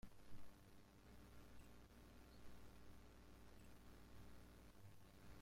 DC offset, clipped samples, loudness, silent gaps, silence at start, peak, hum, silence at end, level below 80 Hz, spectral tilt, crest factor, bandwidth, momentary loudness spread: under 0.1%; under 0.1%; -67 LUFS; none; 0.05 s; -44 dBFS; none; 0 s; -68 dBFS; -5 dB/octave; 16 dB; 16 kHz; 2 LU